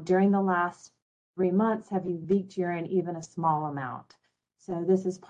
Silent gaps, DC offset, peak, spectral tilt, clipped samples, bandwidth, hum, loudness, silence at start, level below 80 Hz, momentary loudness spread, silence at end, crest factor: 1.02-1.34 s; under 0.1%; -12 dBFS; -8 dB/octave; under 0.1%; 9 kHz; none; -28 LUFS; 0 s; -70 dBFS; 13 LU; 0.1 s; 16 dB